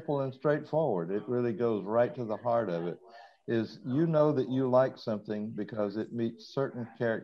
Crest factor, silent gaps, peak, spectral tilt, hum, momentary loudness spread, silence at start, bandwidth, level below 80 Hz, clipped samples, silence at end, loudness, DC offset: 18 dB; none; -14 dBFS; -9 dB/octave; none; 9 LU; 0 s; 6.6 kHz; -76 dBFS; under 0.1%; 0 s; -31 LUFS; under 0.1%